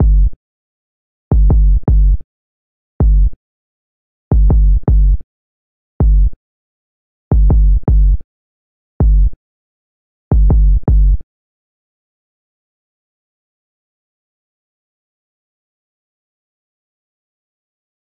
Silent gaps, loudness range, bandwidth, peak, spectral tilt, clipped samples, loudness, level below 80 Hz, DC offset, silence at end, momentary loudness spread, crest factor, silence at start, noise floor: 0.36-1.31 s, 2.24-3.00 s, 3.36-4.31 s, 5.24-6.00 s, 6.36-7.31 s, 8.24-9.00 s, 9.36-10.31 s; 1 LU; 1.5 kHz; -4 dBFS; -14.5 dB/octave; under 0.1%; -15 LUFS; -14 dBFS; 3%; 6.75 s; 8 LU; 10 dB; 0 s; under -90 dBFS